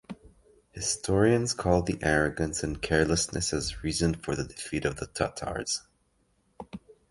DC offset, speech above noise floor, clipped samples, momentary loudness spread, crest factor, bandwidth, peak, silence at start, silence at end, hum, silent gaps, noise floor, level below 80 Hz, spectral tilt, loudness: under 0.1%; 42 dB; under 0.1%; 20 LU; 22 dB; 11.5 kHz; -8 dBFS; 0.1 s; 0.2 s; none; none; -70 dBFS; -44 dBFS; -4 dB/octave; -28 LUFS